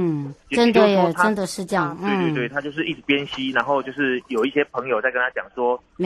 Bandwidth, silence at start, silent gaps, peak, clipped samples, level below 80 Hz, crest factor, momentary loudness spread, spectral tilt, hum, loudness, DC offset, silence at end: 12.5 kHz; 0 s; none; -4 dBFS; under 0.1%; -58 dBFS; 18 dB; 8 LU; -5.5 dB/octave; none; -21 LUFS; under 0.1%; 0 s